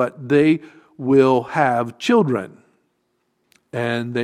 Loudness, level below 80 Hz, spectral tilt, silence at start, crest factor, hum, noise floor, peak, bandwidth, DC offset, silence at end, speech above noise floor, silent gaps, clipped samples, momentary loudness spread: -18 LUFS; -62 dBFS; -7 dB/octave; 0 s; 18 dB; none; -69 dBFS; -2 dBFS; 11.5 kHz; under 0.1%; 0 s; 51 dB; none; under 0.1%; 11 LU